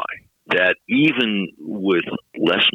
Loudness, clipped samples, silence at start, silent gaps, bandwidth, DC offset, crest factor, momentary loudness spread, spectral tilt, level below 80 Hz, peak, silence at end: -19 LUFS; under 0.1%; 0 s; none; 7.4 kHz; under 0.1%; 14 dB; 13 LU; -6.5 dB/octave; -64 dBFS; -6 dBFS; 0.05 s